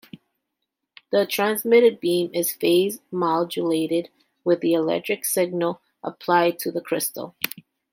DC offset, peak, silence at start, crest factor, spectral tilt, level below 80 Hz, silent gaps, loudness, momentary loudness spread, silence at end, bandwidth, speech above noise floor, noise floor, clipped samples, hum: under 0.1%; -2 dBFS; 1.1 s; 22 dB; -4 dB/octave; -74 dBFS; none; -22 LUFS; 11 LU; 0.35 s; 16.5 kHz; 59 dB; -81 dBFS; under 0.1%; none